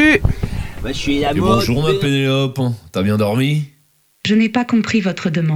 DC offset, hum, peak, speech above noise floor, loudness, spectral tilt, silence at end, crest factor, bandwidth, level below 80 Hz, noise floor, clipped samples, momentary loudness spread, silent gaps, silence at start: under 0.1%; none; 0 dBFS; 41 dB; -17 LUFS; -6 dB/octave; 0 s; 16 dB; 19.5 kHz; -32 dBFS; -57 dBFS; under 0.1%; 9 LU; none; 0 s